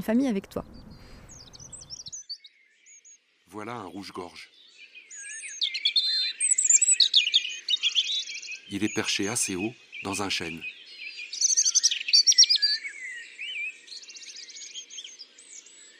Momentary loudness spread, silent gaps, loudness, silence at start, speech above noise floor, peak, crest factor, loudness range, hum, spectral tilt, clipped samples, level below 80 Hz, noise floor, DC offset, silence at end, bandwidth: 23 LU; none; -22 LUFS; 0 s; 27 dB; -6 dBFS; 22 dB; 20 LU; none; 0 dB/octave; under 0.1%; -62 dBFS; -57 dBFS; under 0.1%; 0.15 s; 15.5 kHz